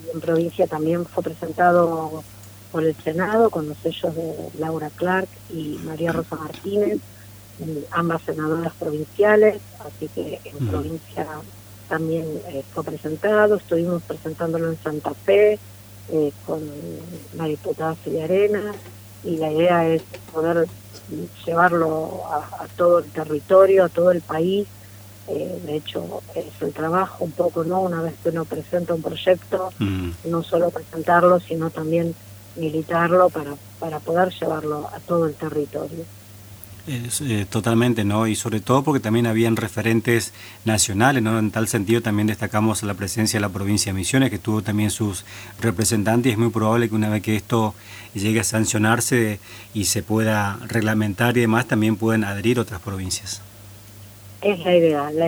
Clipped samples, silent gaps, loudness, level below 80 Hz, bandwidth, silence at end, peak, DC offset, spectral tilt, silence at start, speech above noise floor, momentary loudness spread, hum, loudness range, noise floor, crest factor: under 0.1%; none; -21 LUFS; -54 dBFS; over 20 kHz; 0 s; 0 dBFS; under 0.1%; -5.5 dB/octave; 0 s; 21 dB; 15 LU; none; 6 LU; -42 dBFS; 20 dB